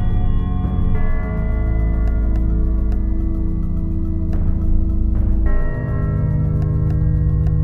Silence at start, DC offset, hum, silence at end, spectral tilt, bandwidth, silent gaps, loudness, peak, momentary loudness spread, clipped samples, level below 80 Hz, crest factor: 0 s; under 0.1%; none; 0 s; -11 dB/octave; 3.6 kHz; none; -20 LUFS; -4 dBFS; 5 LU; under 0.1%; -18 dBFS; 12 dB